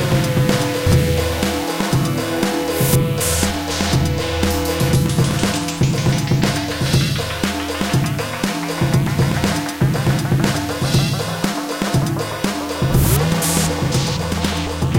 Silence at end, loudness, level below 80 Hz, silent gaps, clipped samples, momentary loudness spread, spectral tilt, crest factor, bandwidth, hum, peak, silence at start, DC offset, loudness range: 0 s; -18 LUFS; -32 dBFS; none; under 0.1%; 5 LU; -5 dB/octave; 14 dB; 17 kHz; none; -2 dBFS; 0 s; under 0.1%; 1 LU